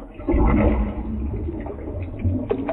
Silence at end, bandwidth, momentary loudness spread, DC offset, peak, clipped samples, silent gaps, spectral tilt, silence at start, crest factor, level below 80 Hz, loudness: 0 s; 3.8 kHz; 12 LU; under 0.1%; -6 dBFS; under 0.1%; none; -12 dB/octave; 0 s; 16 dB; -26 dBFS; -24 LUFS